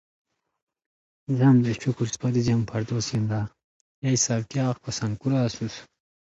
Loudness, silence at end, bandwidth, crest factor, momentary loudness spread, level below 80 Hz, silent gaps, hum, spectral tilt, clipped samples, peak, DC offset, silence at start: -25 LUFS; 0.4 s; 8 kHz; 16 dB; 12 LU; -56 dBFS; 3.64-4.02 s; none; -5.5 dB/octave; under 0.1%; -8 dBFS; under 0.1%; 1.3 s